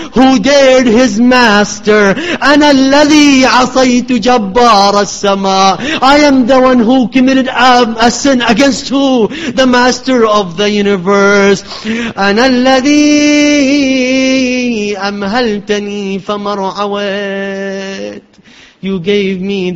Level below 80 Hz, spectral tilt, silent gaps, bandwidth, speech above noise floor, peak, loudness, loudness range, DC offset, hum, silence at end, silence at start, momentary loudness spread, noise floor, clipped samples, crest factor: -40 dBFS; -4 dB/octave; none; 8.2 kHz; 31 dB; 0 dBFS; -9 LUFS; 8 LU; under 0.1%; none; 0 s; 0 s; 10 LU; -39 dBFS; 0.4%; 8 dB